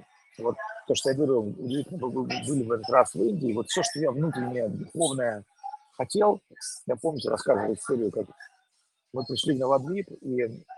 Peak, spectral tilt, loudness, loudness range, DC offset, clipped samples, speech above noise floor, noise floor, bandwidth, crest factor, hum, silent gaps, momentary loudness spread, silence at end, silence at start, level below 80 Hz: -6 dBFS; -4.5 dB/octave; -28 LUFS; 2 LU; under 0.1%; under 0.1%; 46 dB; -73 dBFS; 12.5 kHz; 22 dB; none; none; 12 LU; 0 s; 0.4 s; -70 dBFS